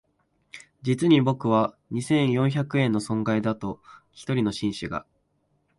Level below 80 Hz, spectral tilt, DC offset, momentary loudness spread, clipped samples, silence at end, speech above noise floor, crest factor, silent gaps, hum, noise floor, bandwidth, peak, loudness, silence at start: -58 dBFS; -6.5 dB/octave; under 0.1%; 15 LU; under 0.1%; 0.75 s; 46 dB; 18 dB; none; none; -70 dBFS; 11.5 kHz; -8 dBFS; -25 LUFS; 0.55 s